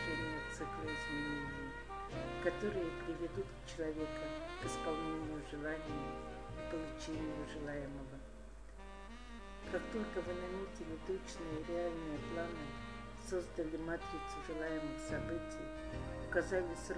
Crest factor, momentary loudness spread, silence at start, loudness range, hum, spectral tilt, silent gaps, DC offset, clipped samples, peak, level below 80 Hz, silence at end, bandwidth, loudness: 22 dB; 9 LU; 0 s; 4 LU; none; -5.5 dB/octave; none; 0.1%; under 0.1%; -22 dBFS; -54 dBFS; 0 s; 10.5 kHz; -43 LUFS